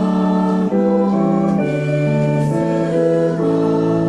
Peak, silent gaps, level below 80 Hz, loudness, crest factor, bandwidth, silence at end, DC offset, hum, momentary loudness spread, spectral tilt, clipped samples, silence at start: -6 dBFS; none; -50 dBFS; -16 LUFS; 10 dB; 10.5 kHz; 0 s; under 0.1%; none; 2 LU; -9 dB/octave; under 0.1%; 0 s